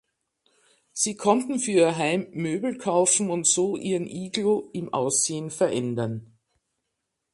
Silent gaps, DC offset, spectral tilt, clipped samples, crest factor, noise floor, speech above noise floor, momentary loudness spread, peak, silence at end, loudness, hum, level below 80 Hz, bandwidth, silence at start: none; under 0.1%; -3.5 dB/octave; under 0.1%; 20 dB; -80 dBFS; 56 dB; 9 LU; -6 dBFS; 1.1 s; -24 LUFS; none; -68 dBFS; 11.5 kHz; 0.95 s